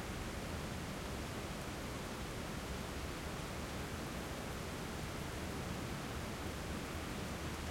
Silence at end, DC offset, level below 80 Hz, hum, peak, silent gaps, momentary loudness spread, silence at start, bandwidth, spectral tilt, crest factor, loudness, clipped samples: 0 s; under 0.1%; -52 dBFS; none; -30 dBFS; none; 1 LU; 0 s; 16.5 kHz; -4.5 dB/octave; 12 dB; -44 LUFS; under 0.1%